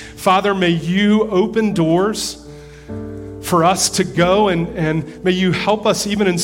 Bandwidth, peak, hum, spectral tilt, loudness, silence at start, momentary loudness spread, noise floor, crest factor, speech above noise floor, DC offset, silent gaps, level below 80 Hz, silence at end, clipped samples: 16.5 kHz; -2 dBFS; none; -4.5 dB/octave; -16 LUFS; 0 s; 14 LU; -36 dBFS; 16 dB; 21 dB; under 0.1%; none; -42 dBFS; 0 s; under 0.1%